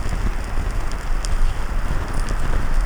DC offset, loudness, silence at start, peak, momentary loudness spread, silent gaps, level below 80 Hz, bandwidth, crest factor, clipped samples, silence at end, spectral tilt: under 0.1%; -27 LUFS; 0 s; -6 dBFS; 2 LU; none; -20 dBFS; 11 kHz; 14 dB; under 0.1%; 0 s; -5 dB/octave